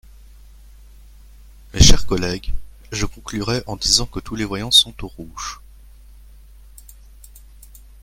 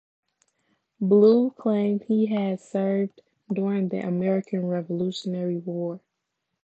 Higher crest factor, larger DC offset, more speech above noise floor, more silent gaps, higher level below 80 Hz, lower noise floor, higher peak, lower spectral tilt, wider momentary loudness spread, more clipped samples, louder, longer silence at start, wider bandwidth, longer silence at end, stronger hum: about the same, 20 dB vs 18 dB; neither; second, 26 dB vs 57 dB; neither; first, -28 dBFS vs -76 dBFS; second, -43 dBFS vs -80 dBFS; first, 0 dBFS vs -8 dBFS; second, -3 dB/octave vs -8.5 dB/octave; first, 21 LU vs 12 LU; neither; first, -18 LUFS vs -25 LUFS; first, 1.75 s vs 1 s; first, 16 kHz vs 8.2 kHz; first, 2.5 s vs 0.65 s; neither